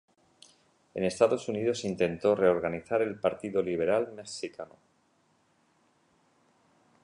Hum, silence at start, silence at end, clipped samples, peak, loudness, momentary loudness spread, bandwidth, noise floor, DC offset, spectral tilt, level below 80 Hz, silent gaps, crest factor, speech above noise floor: none; 0.95 s; 2.4 s; under 0.1%; -10 dBFS; -29 LUFS; 13 LU; 11 kHz; -69 dBFS; under 0.1%; -5.5 dB/octave; -64 dBFS; none; 22 dB; 41 dB